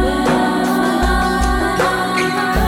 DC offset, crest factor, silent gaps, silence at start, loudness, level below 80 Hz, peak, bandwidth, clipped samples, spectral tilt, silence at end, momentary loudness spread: under 0.1%; 12 dB; none; 0 s; -16 LUFS; -24 dBFS; -4 dBFS; 17 kHz; under 0.1%; -5 dB/octave; 0 s; 1 LU